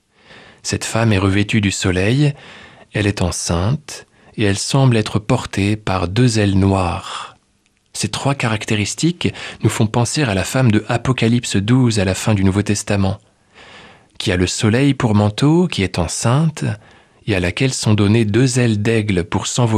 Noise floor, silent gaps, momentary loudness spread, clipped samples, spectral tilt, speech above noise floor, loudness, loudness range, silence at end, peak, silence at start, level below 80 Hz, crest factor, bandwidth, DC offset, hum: -60 dBFS; none; 9 LU; under 0.1%; -5.5 dB/octave; 44 dB; -17 LUFS; 2 LU; 0 s; -2 dBFS; 0.3 s; -42 dBFS; 16 dB; 13.5 kHz; under 0.1%; none